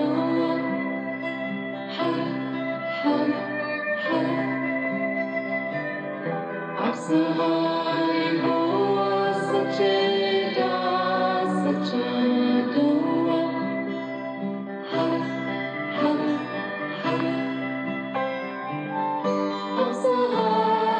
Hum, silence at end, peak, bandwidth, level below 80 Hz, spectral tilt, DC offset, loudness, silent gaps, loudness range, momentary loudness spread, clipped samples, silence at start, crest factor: none; 0 s; -10 dBFS; 9.4 kHz; -80 dBFS; -6.5 dB/octave; under 0.1%; -25 LUFS; none; 4 LU; 8 LU; under 0.1%; 0 s; 14 dB